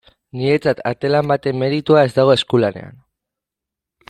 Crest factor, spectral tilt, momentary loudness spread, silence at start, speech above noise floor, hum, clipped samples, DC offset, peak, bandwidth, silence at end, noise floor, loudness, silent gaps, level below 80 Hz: 16 dB; -7 dB/octave; 9 LU; 0.35 s; 69 dB; none; under 0.1%; under 0.1%; -2 dBFS; 12 kHz; 1.2 s; -85 dBFS; -16 LUFS; none; -56 dBFS